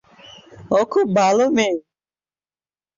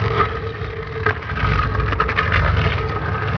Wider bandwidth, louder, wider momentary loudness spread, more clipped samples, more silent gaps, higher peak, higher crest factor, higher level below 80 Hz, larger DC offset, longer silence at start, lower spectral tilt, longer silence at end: first, 7.6 kHz vs 5.4 kHz; about the same, -18 LUFS vs -20 LUFS; second, 6 LU vs 9 LU; neither; neither; about the same, -4 dBFS vs -2 dBFS; about the same, 16 dB vs 18 dB; second, -62 dBFS vs -28 dBFS; neither; first, 0.3 s vs 0 s; second, -5 dB/octave vs -7.5 dB/octave; first, 1.15 s vs 0 s